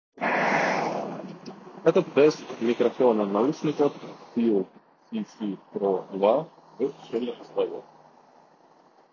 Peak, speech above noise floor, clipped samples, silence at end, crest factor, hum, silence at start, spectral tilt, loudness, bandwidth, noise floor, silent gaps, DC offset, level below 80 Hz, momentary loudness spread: -6 dBFS; 33 dB; under 0.1%; 1.3 s; 20 dB; none; 0.15 s; -6 dB/octave; -26 LUFS; 7.2 kHz; -57 dBFS; none; under 0.1%; -76 dBFS; 15 LU